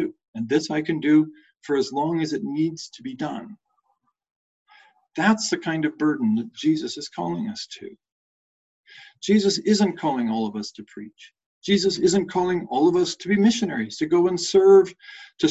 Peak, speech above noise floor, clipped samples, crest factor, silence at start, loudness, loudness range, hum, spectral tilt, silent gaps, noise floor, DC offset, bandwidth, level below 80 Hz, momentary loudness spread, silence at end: -4 dBFS; 50 dB; under 0.1%; 18 dB; 0 s; -22 LUFS; 8 LU; none; -5 dB/octave; 0.28-0.33 s, 4.31-4.66 s, 8.12-8.84 s, 11.46-11.61 s; -72 dBFS; under 0.1%; 8.2 kHz; -64 dBFS; 16 LU; 0 s